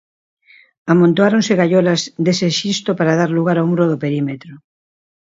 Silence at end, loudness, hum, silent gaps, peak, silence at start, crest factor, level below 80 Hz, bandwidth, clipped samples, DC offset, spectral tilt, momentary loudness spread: 0.75 s; -15 LUFS; none; none; 0 dBFS; 0.85 s; 16 dB; -62 dBFS; 7.8 kHz; under 0.1%; under 0.1%; -5.5 dB/octave; 7 LU